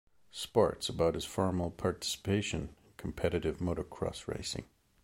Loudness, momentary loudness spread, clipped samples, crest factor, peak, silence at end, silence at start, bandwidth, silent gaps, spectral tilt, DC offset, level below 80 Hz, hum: -34 LUFS; 12 LU; under 0.1%; 22 dB; -12 dBFS; 0.4 s; 0.35 s; 16.5 kHz; none; -5 dB/octave; under 0.1%; -52 dBFS; none